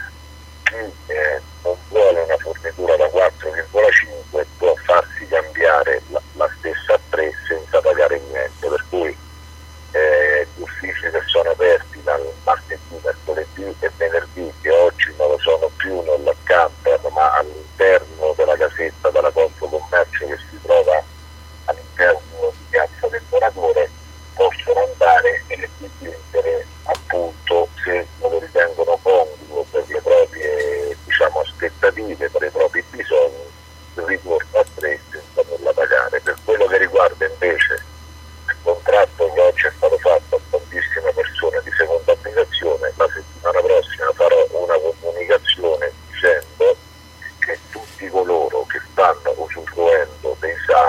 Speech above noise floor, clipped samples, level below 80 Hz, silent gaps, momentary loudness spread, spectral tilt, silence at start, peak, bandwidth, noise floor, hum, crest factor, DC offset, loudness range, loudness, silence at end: 19 dB; under 0.1%; -42 dBFS; none; 11 LU; -4 dB/octave; 0 s; -2 dBFS; 14.5 kHz; -41 dBFS; none; 16 dB; under 0.1%; 3 LU; -18 LUFS; 0 s